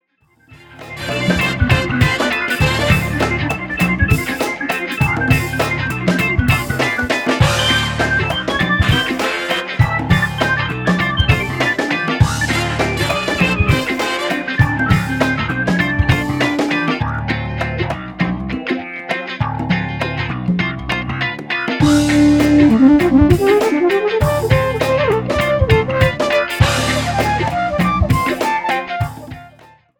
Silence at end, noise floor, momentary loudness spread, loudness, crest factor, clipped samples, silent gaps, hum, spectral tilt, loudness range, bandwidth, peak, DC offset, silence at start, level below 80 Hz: 0.5 s; -55 dBFS; 8 LU; -16 LUFS; 16 dB; under 0.1%; none; none; -5.5 dB/octave; 6 LU; over 20 kHz; 0 dBFS; under 0.1%; 0.5 s; -30 dBFS